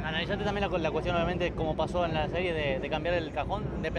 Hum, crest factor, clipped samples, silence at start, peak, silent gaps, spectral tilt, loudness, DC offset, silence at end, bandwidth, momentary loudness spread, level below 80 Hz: none; 14 dB; under 0.1%; 0 s; -16 dBFS; none; -6.5 dB/octave; -30 LUFS; under 0.1%; 0 s; 10.5 kHz; 3 LU; -42 dBFS